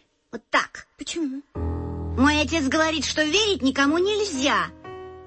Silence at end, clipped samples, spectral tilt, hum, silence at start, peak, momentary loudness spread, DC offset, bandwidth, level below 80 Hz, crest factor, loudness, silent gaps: 0 s; under 0.1%; -3.5 dB/octave; none; 0.35 s; -8 dBFS; 14 LU; under 0.1%; 8.8 kHz; -42 dBFS; 16 dB; -23 LUFS; none